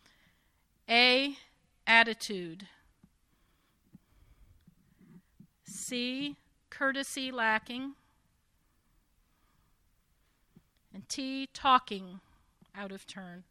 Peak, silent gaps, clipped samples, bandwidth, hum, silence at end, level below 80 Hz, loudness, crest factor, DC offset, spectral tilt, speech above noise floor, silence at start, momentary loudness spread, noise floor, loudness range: -8 dBFS; none; under 0.1%; 15.5 kHz; none; 0.1 s; -70 dBFS; -29 LUFS; 28 dB; under 0.1%; -2 dB/octave; 38 dB; 0.9 s; 23 LU; -72 dBFS; 17 LU